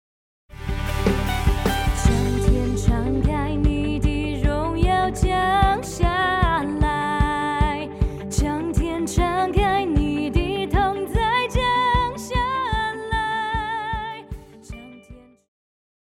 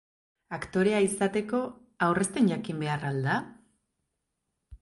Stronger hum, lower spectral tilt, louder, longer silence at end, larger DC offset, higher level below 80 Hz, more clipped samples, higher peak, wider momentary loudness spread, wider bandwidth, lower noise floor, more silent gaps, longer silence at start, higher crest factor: neither; about the same, -5.5 dB/octave vs -5.5 dB/octave; first, -22 LUFS vs -28 LUFS; first, 0.85 s vs 0.05 s; neither; first, -26 dBFS vs -60 dBFS; neither; first, -4 dBFS vs -12 dBFS; second, 7 LU vs 12 LU; first, 16.5 kHz vs 11.5 kHz; second, -46 dBFS vs -82 dBFS; neither; about the same, 0.5 s vs 0.5 s; about the same, 18 dB vs 18 dB